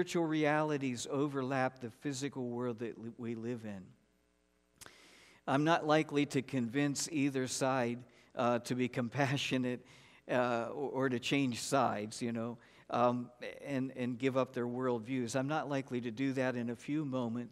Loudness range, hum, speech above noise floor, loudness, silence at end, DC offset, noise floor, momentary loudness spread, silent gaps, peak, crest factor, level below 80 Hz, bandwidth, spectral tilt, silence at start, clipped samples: 6 LU; none; 40 dB; -35 LUFS; 0 s; under 0.1%; -75 dBFS; 11 LU; none; -16 dBFS; 20 dB; -78 dBFS; 15 kHz; -5 dB/octave; 0 s; under 0.1%